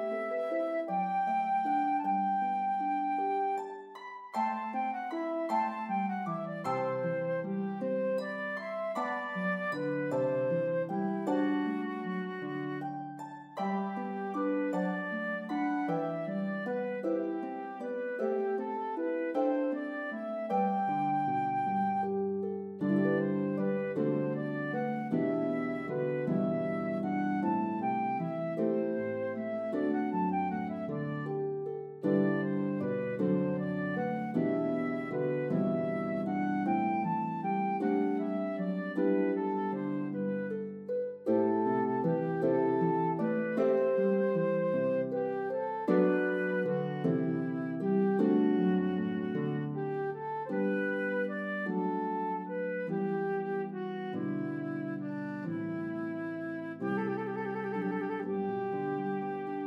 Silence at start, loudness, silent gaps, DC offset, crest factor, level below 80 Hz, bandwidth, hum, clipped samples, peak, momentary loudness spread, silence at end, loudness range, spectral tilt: 0 s; -33 LUFS; none; under 0.1%; 18 dB; -84 dBFS; 7.6 kHz; none; under 0.1%; -14 dBFS; 7 LU; 0 s; 5 LU; -9 dB/octave